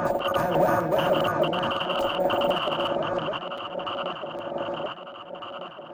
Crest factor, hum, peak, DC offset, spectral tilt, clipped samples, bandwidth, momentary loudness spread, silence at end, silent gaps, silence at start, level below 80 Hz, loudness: 16 dB; none; -10 dBFS; under 0.1%; -5.5 dB/octave; under 0.1%; 17 kHz; 14 LU; 0 s; none; 0 s; -56 dBFS; -26 LUFS